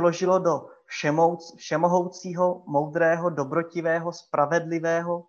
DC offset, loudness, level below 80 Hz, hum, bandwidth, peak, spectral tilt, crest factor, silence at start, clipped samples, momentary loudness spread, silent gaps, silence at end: under 0.1%; -25 LUFS; -74 dBFS; none; 7.4 kHz; -8 dBFS; -6 dB/octave; 18 dB; 0 s; under 0.1%; 7 LU; none; 0.05 s